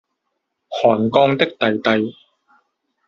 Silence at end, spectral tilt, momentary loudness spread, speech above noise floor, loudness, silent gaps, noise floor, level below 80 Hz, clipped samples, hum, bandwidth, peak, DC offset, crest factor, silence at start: 0.95 s; -3.5 dB/octave; 8 LU; 59 dB; -17 LUFS; none; -75 dBFS; -62 dBFS; under 0.1%; none; 7.2 kHz; 0 dBFS; under 0.1%; 18 dB; 0.7 s